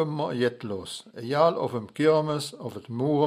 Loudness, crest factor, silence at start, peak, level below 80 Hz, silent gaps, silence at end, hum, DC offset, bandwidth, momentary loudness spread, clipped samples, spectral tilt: -27 LUFS; 18 dB; 0 s; -8 dBFS; -68 dBFS; none; 0 s; none; under 0.1%; 15 kHz; 13 LU; under 0.1%; -6 dB/octave